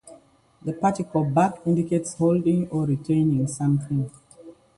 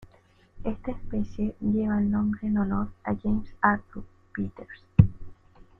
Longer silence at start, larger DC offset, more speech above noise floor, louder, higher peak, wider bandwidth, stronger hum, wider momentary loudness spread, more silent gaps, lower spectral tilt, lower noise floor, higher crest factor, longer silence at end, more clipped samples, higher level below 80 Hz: about the same, 0.05 s vs 0 s; neither; about the same, 32 dB vs 33 dB; first, -23 LUFS vs -27 LUFS; second, -6 dBFS vs -2 dBFS; first, 11.5 kHz vs 3.7 kHz; neither; second, 7 LU vs 13 LU; neither; second, -8 dB/octave vs -10.5 dB/octave; second, -54 dBFS vs -59 dBFS; second, 16 dB vs 26 dB; second, 0.25 s vs 0.45 s; neither; second, -56 dBFS vs -42 dBFS